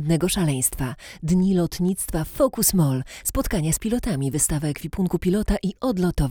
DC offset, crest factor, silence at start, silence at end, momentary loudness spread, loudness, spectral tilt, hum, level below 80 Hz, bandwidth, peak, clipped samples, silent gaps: under 0.1%; 16 dB; 0 s; 0 s; 7 LU; -23 LUFS; -5 dB/octave; none; -34 dBFS; over 20 kHz; -6 dBFS; under 0.1%; none